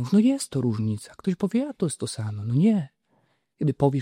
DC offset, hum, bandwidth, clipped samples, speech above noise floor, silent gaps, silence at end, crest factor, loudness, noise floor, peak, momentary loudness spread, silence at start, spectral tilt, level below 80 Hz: under 0.1%; none; 14 kHz; under 0.1%; 44 dB; none; 0 s; 16 dB; -25 LUFS; -68 dBFS; -8 dBFS; 9 LU; 0 s; -7 dB/octave; -60 dBFS